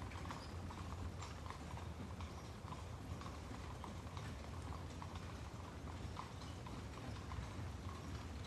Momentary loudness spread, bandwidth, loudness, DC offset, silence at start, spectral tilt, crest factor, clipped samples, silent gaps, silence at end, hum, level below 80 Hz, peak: 2 LU; 13 kHz; -50 LUFS; under 0.1%; 0 s; -5.5 dB/octave; 16 dB; under 0.1%; none; 0 s; none; -56 dBFS; -34 dBFS